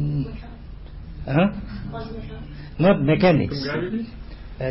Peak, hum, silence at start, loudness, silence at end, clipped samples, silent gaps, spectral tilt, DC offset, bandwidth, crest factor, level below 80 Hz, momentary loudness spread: -8 dBFS; none; 0 s; -22 LUFS; 0 s; under 0.1%; none; -11.5 dB/octave; under 0.1%; 5.8 kHz; 16 dB; -38 dBFS; 23 LU